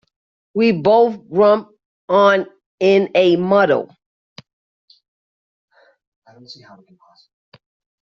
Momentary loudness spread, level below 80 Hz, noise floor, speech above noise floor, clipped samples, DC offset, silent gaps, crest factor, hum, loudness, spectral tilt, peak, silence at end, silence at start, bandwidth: 7 LU; -64 dBFS; under -90 dBFS; over 75 dB; under 0.1%; under 0.1%; 1.86-2.08 s, 2.66-2.78 s, 4.06-4.36 s, 4.53-4.88 s, 5.08-5.68 s, 6.07-6.22 s; 16 dB; none; -15 LUFS; -4.5 dB/octave; -2 dBFS; 1.5 s; 0.55 s; 7 kHz